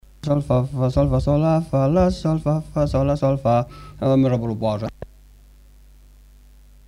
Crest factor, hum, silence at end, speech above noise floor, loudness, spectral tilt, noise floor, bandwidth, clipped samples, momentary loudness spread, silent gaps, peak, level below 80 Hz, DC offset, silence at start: 16 dB; 50 Hz at -45 dBFS; 1.8 s; 28 dB; -20 LUFS; -9 dB/octave; -48 dBFS; 11 kHz; under 0.1%; 6 LU; none; -4 dBFS; -36 dBFS; under 0.1%; 0.25 s